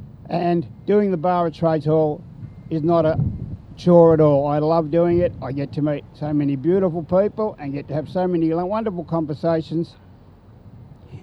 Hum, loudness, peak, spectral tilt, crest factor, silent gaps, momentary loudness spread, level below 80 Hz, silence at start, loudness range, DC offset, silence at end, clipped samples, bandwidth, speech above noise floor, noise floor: none; -20 LUFS; 0 dBFS; -10 dB/octave; 20 dB; none; 11 LU; -46 dBFS; 0 s; 6 LU; under 0.1%; 0.05 s; under 0.1%; 6.2 kHz; 27 dB; -46 dBFS